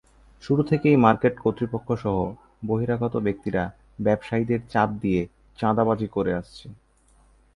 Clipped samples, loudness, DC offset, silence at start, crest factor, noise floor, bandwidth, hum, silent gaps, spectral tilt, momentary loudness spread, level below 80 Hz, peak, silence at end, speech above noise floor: under 0.1%; -24 LUFS; under 0.1%; 0.45 s; 22 dB; -59 dBFS; 11 kHz; none; none; -9 dB/octave; 12 LU; -50 dBFS; -4 dBFS; 0.8 s; 35 dB